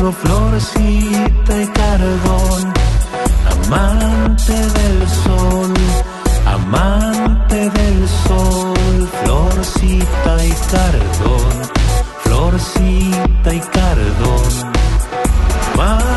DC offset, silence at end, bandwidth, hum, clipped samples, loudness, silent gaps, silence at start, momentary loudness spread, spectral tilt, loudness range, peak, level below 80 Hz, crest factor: under 0.1%; 0 s; 12.5 kHz; none; under 0.1%; -14 LUFS; none; 0 s; 2 LU; -5.5 dB/octave; 1 LU; -2 dBFS; -14 dBFS; 10 dB